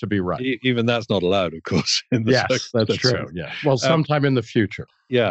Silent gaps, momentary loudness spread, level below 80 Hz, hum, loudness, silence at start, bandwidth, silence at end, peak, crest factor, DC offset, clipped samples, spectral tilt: none; 6 LU; -54 dBFS; none; -21 LUFS; 0 s; 8.2 kHz; 0 s; -4 dBFS; 16 dB; under 0.1%; under 0.1%; -5 dB/octave